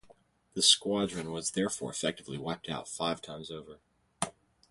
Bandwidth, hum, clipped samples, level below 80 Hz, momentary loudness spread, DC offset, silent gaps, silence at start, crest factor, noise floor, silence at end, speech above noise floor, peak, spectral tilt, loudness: 12 kHz; none; under 0.1%; -66 dBFS; 19 LU; under 0.1%; none; 0.05 s; 24 dB; -63 dBFS; 0.4 s; 30 dB; -10 dBFS; -2.5 dB/octave; -31 LUFS